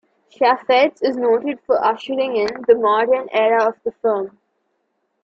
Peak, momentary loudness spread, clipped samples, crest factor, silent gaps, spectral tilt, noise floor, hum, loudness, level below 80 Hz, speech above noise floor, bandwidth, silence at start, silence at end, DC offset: -2 dBFS; 6 LU; under 0.1%; 16 dB; none; -5 dB/octave; -70 dBFS; none; -18 LUFS; -66 dBFS; 53 dB; 7.4 kHz; 0.4 s; 0.95 s; under 0.1%